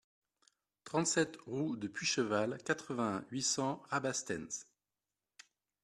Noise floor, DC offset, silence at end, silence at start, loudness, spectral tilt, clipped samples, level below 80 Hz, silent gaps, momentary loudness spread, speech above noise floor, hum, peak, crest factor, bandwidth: under -90 dBFS; under 0.1%; 1.2 s; 0.85 s; -36 LUFS; -3.5 dB/octave; under 0.1%; -76 dBFS; none; 7 LU; over 53 dB; none; -18 dBFS; 22 dB; 13 kHz